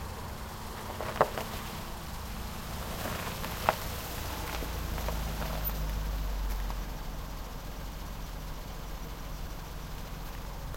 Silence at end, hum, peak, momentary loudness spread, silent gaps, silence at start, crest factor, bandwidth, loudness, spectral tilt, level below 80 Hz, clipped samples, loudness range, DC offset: 0 s; none; -6 dBFS; 11 LU; none; 0 s; 30 dB; 16.5 kHz; -37 LUFS; -4.5 dB/octave; -38 dBFS; under 0.1%; 7 LU; under 0.1%